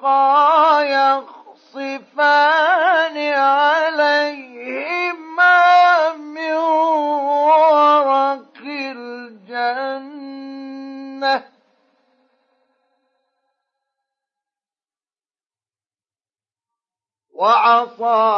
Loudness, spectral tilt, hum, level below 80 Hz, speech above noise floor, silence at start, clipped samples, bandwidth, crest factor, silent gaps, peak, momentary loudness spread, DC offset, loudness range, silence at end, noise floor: -15 LUFS; -2.5 dB/octave; none; under -90 dBFS; over 75 dB; 0 s; under 0.1%; 7.2 kHz; 14 dB; none; -4 dBFS; 20 LU; under 0.1%; 14 LU; 0 s; under -90 dBFS